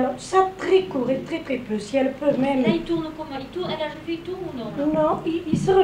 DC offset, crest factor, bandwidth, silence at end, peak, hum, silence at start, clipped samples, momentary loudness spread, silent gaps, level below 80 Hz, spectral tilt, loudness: under 0.1%; 18 dB; 11 kHz; 0 s; -6 dBFS; none; 0 s; under 0.1%; 10 LU; none; -50 dBFS; -6 dB/octave; -24 LUFS